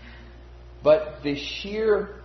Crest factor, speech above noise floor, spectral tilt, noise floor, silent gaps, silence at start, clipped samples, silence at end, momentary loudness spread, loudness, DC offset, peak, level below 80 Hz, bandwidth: 20 dB; 21 dB; -5.5 dB/octave; -44 dBFS; none; 0 s; under 0.1%; 0 s; 9 LU; -24 LUFS; under 0.1%; -6 dBFS; -46 dBFS; 6.4 kHz